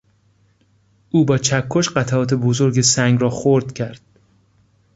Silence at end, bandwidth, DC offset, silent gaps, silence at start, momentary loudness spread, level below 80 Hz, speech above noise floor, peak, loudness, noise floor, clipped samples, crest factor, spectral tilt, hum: 1 s; 8 kHz; under 0.1%; none; 1.15 s; 7 LU; -52 dBFS; 42 dB; -2 dBFS; -17 LUFS; -58 dBFS; under 0.1%; 18 dB; -5 dB/octave; none